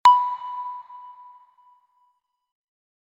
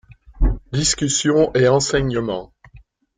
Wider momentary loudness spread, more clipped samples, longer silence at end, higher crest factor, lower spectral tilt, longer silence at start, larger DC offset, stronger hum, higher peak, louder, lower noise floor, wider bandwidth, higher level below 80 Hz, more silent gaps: first, 26 LU vs 9 LU; neither; first, 1.95 s vs 0.4 s; about the same, 20 dB vs 16 dB; second, 1 dB/octave vs -4 dB/octave; second, 0.05 s vs 0.35 s; neither; neither; about the same, -6 dBFS vs -4 dBFS; second, -23 LUFS vs -18 LUFS; first, -69 dBFS vs -48 dBFS; about the same, 10 kHz vs 9.6 kHz; second, -72 dBFS vs -28 dBFS; neither